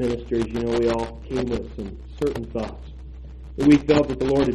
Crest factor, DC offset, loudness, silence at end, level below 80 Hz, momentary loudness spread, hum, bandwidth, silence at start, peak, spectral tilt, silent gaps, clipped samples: 18 dB; under 0.1%; -22 LUFS; 0 s; -38 dBFS; 22 LU; none; 11.5 kHz; 0 s; -4 dBFS; -7 dB/octave; none; under 0.1%